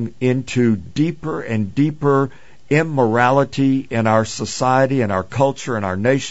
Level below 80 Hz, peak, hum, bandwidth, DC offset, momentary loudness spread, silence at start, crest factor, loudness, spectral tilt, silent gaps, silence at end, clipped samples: -50 dBFS; -2 dBFS; none; 8 kHz; 1%; 7 LU; 0 s; 16 dB; -18 LUFS; -6.5 dB/octave; none; 0 s; under 0.1%